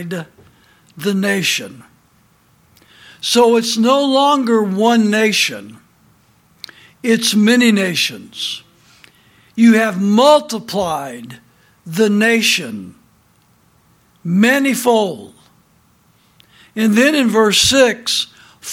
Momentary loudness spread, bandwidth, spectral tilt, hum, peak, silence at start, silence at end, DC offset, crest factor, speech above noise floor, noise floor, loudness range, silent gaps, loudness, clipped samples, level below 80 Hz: 18 LU; 16.5 kHz; -3.5 dB/octave; none; 0 dBFS; 0 s; 0 s; under 0.1%; 16 dB; 40 dB; -54 dBFS; 5 LU; none; -14 LUFS; under 0.1%; -54 dBFS